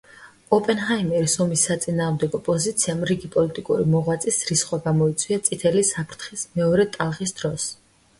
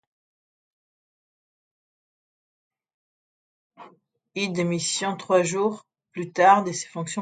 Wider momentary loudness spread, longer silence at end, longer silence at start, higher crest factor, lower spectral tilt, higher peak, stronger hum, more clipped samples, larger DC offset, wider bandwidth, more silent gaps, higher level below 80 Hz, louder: second, 7 LU vs 18 LU; first, 0.45 s vs 0 s; second, 0.2 s vs 3.8 s; second, 18 dB vs 24 dB; about the same, -4.5 dB/octave vs -4 dB/octave; about the same, -4 dBFS vs -4 dBFS; neither; neither; neither; first, 11.5 kHz vs 9.4 kHz; neither; first, -54 dBFS vs -74 dBFS; about the same, -22 LUFS vs -23 LUFS